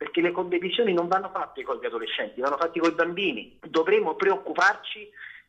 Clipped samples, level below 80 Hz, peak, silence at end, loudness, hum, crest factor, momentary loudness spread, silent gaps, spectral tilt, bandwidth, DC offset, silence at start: under 0.1%; -70 dBFS; -8 dBFS; 0.1 s; -25 LUFS; none; 18 dB; 10 LU; none; -4.5 dB/octave; 8.2 kHz; under 0.1%; 0 s